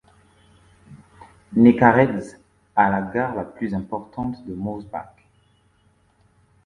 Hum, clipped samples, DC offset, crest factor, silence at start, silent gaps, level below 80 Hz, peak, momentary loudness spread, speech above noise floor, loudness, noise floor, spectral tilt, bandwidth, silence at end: none; under 0.1%; under 0.1%; 22 dB; 0.9 s; none; -54 dBFS; 0 dBFS; 17 LU; 41 dB; -21 LUFS; -61 dBFS; -8.5 dB/octave; 9.6 kHz; 1.6 s